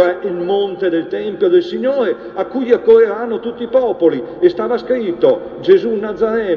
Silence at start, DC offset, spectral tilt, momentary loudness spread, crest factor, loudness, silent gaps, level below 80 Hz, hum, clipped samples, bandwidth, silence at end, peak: 0 s; under 0.1%; -7.5 dB/octave; 9 LU; 14 dB; -15 LUFS; none; -54 dBFS; none; under 0.1%; 6 kHz; 0 s; 0 dBFS